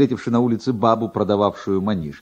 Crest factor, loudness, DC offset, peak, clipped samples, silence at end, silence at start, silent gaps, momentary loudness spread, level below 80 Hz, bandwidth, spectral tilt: 16 dB; -20 LUFS; under 0.1%; -4 dBFS; under 0.1%; 0 s; 0 s; none; 3 LU; -54 dBFS; 8.2 kHz; -8 dB/octave